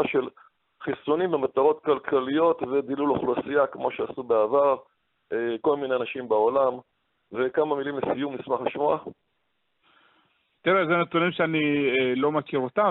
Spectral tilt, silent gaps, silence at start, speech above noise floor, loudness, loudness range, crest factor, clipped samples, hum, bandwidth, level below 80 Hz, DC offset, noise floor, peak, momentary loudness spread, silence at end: -4 dB/octave; none; 0 s; 51 dB; -25 LUFS; 4 LU; 16 dB; under 0.1%; none; 4.1 kHz; -66 dBFS; under 0.1%; -76 dBFS; -8 dBFS; 8 LU; 0 s